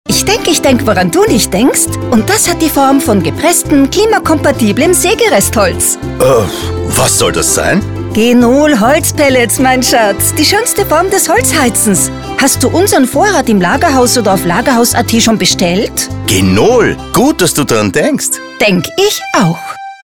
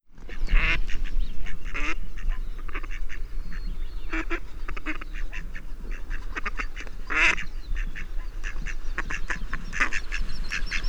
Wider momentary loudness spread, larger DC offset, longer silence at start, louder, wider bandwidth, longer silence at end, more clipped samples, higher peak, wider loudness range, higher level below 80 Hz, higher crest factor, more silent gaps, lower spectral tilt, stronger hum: second, 4 LU vs 14 LU; first, 0.4% vs under 0.1%; about the same, 0.05 s vs 0.1 s; first, -9 LUFS vs -31 LUFS; first, 19.5 kHz vs 8.2 kHz; about the same, 0.1 s vs 0 s; neither; first, 0 dBFS vs -6 dBFS; second, 1 LU vs 7 LU; about the same, -32 dBFS vs -28 dBFS; second, 10 dB vs 18 dB; neither; about the same, -3.5 dB/octave vs -3.5 dB/octave; neither